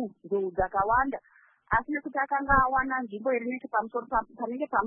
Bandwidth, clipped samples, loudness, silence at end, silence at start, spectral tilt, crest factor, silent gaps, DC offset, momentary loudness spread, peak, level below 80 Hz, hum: 3.5 kHz; under 0.1%; -28 LUFS; 0 s; 0 s; -10.5 dB/octave; 20 dB; none; under 0.1%; 9 LU; -8 dBFS; -46 dBFS; none